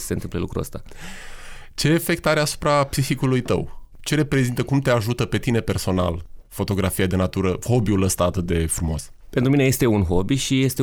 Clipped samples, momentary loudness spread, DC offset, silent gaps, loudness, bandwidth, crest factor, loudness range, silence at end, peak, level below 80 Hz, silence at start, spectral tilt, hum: under 0.1%; 15 LU; under 0.1%; none; -21 LUFS; over 20 kHz; 14 dB; 2 LU; 0 s; -6 dBFS; -36 dBFS; 0 s; -5.5 dB/octave; none